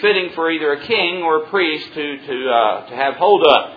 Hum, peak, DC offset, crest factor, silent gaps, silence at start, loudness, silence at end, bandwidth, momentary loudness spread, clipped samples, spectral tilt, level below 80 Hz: none; 0 dBFS; under 0.1%; 16 dB; none; 0 s; -17 LUFS; 0 s; 5.4 kHz; 11 LU; under 0.1%; -6 dB/octave; -62 dBFS